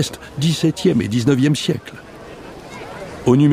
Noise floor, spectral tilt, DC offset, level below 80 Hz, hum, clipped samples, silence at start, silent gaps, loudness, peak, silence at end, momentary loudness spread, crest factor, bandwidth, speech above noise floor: -36 dBFS; -6 dB/octave; under 0.1%; -48 dBFS; none; under 0.1%; 0 s; none; -18 LUFS; -2 dBFS; 0 s; 20 LU; 16 dB; 15.5 kHz; 20 dB